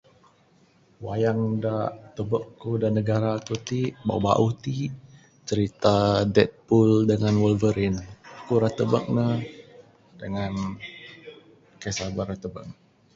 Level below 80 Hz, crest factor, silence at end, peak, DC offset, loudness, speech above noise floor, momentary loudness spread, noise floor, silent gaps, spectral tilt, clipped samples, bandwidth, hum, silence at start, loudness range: -50 dBFS; 22 dB; 0.45 s; -2 dBFS; under 0.1%; -25 LUFS; 36 dB; 19 LU; -60 dBFS; none; -7 dB/octave; under 0.1%; 7.8 kHz; none; 1 s; 9 LU